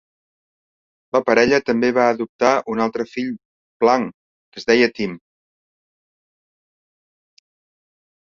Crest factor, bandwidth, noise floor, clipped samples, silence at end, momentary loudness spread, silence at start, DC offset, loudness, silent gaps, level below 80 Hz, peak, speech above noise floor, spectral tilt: 20 dB; 7.4 kHz; under -90 dBFS; under 0.1%; 3.15 s; 13 LU; 1.15 s; under 0.1%; -19 LUFS; 2.29-2.39 s, 3.45-3.80 s, 4.14-4.52 s; -60 dBFS; -2 dBFS; over 72 dB; -4.5 dB/octave